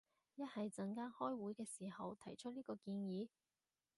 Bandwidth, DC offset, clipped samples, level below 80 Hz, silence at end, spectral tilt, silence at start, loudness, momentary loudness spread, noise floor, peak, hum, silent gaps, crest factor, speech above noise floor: 11.5 kHz; under 0.1%; under 0.1%; -88 dBFS; 0.7 s; -6 dB/octave; 0.35 s; -49 LUFS; 7 LU; under -90 dBFS; -30 dBFS; none; none; 18 dB; over 42 dB